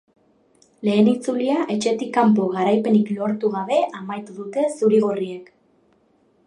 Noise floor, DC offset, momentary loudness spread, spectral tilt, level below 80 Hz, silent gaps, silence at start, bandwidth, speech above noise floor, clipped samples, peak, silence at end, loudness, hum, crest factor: -60 dBFS; under 0.1%; 12 LU; -6.5 dB/octave; -70 dBFS; none; 0.8 s; 10.5 kHz; 41 dB; under 0.1%; -4 dBFS; 1.05 s; -20 LUFS; none; 18 dB